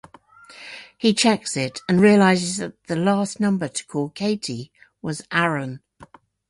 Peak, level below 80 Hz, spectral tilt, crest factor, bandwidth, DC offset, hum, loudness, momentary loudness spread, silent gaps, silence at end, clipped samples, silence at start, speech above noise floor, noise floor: -4 dBFS; -62 dBFS; -5 dB/octave; 18 dB; 11.5 kHz; under 0.1%; none; -21 LUFS; 18 LU; none; 0.45 s; under 0.1%; 0.5 s; 29 dB; -49 dBFS